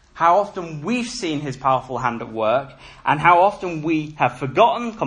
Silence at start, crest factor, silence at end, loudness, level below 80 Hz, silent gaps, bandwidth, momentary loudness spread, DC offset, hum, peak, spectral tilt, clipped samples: 0.15 s; 20 dB; 0 s; -20 LUFS; -52 dBFS; none; 10.5 kHz; 10 LU; under 0.1%; none; 0 dBFS; -5.5 dB/octave; under 0.1%